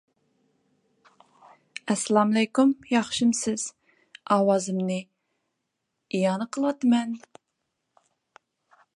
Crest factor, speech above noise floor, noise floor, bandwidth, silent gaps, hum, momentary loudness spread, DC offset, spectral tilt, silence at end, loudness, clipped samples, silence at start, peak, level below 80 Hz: 20 dB; 57 dB; -80 dBFS; 11.5 kHz; none; none; 13 LU; under 0.1%; -4.5 dB/octave; 1.8 s; -25 LUFS; under 0.1%; 1.85 s; -6 dBFS; -72 dBFS